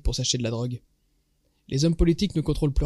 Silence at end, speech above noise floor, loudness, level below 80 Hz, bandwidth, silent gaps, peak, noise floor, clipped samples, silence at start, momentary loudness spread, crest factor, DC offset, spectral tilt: 0 s; 45 dB; -25 LUFS; -32 dBFS; 12.5 kHz; none; -8 dBFS; -68 dBFS; under 0.1%; 0.05 s; 10 LU; 18 dB; under 0.1%; -5.5 dB/octave